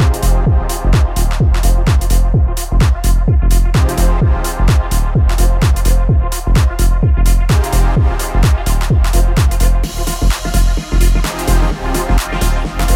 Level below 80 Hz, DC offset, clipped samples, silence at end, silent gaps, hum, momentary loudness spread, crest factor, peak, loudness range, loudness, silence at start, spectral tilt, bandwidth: -12 dBFS; under 0.1%; under 0.1%; 0 s; none; none; 3 LU; 10 dB; 0 dBFS; 1 LU; -14 LUFS; 0 s; -5.5 dB/octave; 16.5 kHz